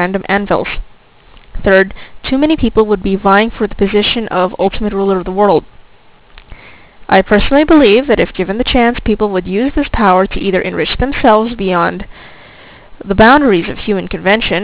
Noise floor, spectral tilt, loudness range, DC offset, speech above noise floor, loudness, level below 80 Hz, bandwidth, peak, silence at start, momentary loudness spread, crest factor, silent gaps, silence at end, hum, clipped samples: -42 dBFS; -9.5 dB/octave; 3 LU; 0.4%; 31 dB; -12 LUFS; -28 dBFS; 4 kHz; 0 dBFS; 0 s; 9 LU; 12 dB; none; 0 s; none; 0.8%